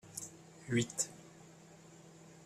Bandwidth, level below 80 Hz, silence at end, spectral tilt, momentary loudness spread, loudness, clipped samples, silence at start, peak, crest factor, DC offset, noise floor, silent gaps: 15 kHz; -74 dBFS; 0 s; -4 dB/octave; 22 LU; -38 LUFS; under 0.1%; 0.05 s; -20 dBFS; 24 dB; under 0.1%; -58 dBFS; none